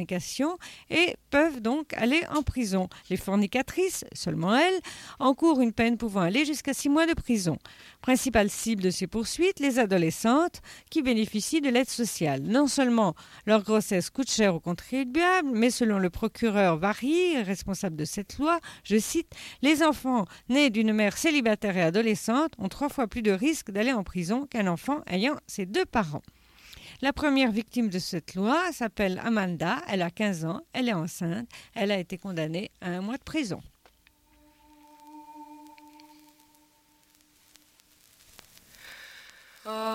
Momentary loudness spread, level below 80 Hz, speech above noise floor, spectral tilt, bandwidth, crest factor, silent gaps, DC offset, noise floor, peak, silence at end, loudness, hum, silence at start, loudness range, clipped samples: 10 LU; -52 dBFS; 37 dB; -4.5 dB/octave; 16 kHz; 18 dB; none; under 0.1%; -64 dBFS; -10 dBFS; 0 s; -27 LUFS; none; 0 s; 6 LU; under 0.1%